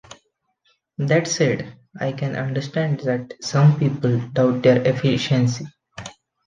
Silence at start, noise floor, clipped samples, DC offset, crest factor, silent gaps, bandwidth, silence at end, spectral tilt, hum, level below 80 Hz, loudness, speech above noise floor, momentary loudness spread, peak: 1 s; -67 dBFS; under 0.1%; under 0.1%; 18 dB; none; 9.2 kHz; 0.35 s; -6 dB/octave; none; -58 dBFS; -20 LUFS; 48 dB; 20 LU; -2 dBFS